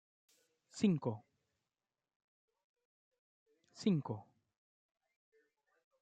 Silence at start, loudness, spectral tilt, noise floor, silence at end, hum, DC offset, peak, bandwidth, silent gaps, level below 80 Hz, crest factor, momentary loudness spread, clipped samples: 0.75 s; -38 LUFS; -7 dB/octave; under -90 dBFS; 1.8 s; none; under 0.1%; -20 dBFS; 9.2 kHz; 2.16-2.48 s, 2.64-2.74 s, 2.85-3.11 s, 3.19-3.46 s; -84 dBFS; 24 dB; 15 LU; under 0.1%